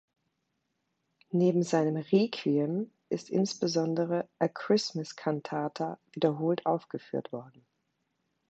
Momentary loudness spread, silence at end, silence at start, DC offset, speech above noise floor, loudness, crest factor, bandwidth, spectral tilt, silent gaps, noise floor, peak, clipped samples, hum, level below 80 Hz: 10 LU; 1 s; 1.35 s; under 0.1%; 51 dB; -30 LUFS; 20 dB; 8.4 kHz; -6 dB/octave; none; -80 dBFS; -12 dBFS; under 0.1%; none; -80 dBFS